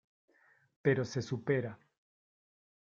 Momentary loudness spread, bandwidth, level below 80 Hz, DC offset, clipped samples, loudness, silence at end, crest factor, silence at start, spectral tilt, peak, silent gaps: 5 LU; 7.6 kHz; -72 dBFS; under 0.1%; under 0.1%; -34 LUFS; 1.1 s; 22 dB; 0.85 s; -6.5 dB/octave; -16 dBFS; none